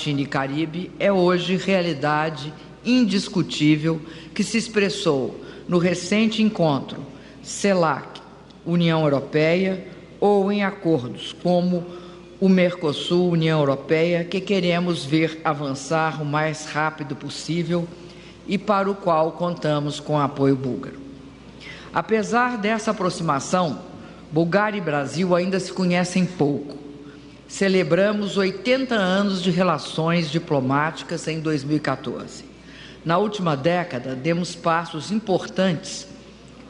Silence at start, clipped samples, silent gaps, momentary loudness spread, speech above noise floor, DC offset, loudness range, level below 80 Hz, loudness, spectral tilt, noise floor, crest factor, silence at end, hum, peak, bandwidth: 0 s; under 0.1%; none; 16 LU; 22 dB; under 0.1%; 3 LU; -56 dBFS; -22 LUFS; -6 dB/octave; -43 dBFS; 16 dB; 0 s; none; -6 dBFS; 11 kHz